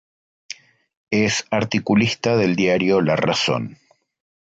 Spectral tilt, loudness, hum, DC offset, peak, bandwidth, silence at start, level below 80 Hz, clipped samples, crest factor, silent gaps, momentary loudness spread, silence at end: -5 dB/octave; -19 LUFS; none; under 0.1%; -4 dBFS; 9 kHz; 0.5 s; -54 dBFS; under 0.1%; 16 dB; 0.97-1.07 s; 18 LU; 0.7 s